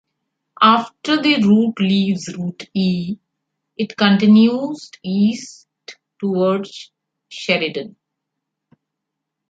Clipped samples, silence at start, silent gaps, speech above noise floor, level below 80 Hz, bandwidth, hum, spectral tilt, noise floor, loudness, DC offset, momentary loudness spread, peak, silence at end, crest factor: under 0.1%; 0.6 s; none; 63 dB; -64 dBFS; 7.8 kHz; none; -6 dB/octave; -80 dBFS; -17 LUFS; under 0.1%; 18 LU; -2 dBFS; 1.6 s; 18 dB